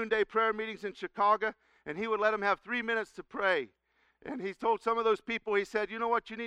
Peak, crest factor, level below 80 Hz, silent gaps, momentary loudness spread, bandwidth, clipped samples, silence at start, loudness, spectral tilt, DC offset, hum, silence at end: -14 dBFS; 18 dB; -68 dBFS; none; 11 LU; 10 kHz; under 0.1%; 0 s; -31 LUFS; -4.5 dB/octave; under 0.1%; none; 0 s